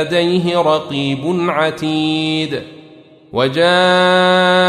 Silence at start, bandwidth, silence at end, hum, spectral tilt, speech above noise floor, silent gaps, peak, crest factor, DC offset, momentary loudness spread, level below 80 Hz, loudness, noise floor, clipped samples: 0 s; 11.5 kHz; 0 s; none; -5.5 dB/octave; 28 dB; none; -2 dBFS; 14 dB; under 0.1%; 8 LU; -56 dBFS; -14 LUFS; -42 dBFS; under 0.1%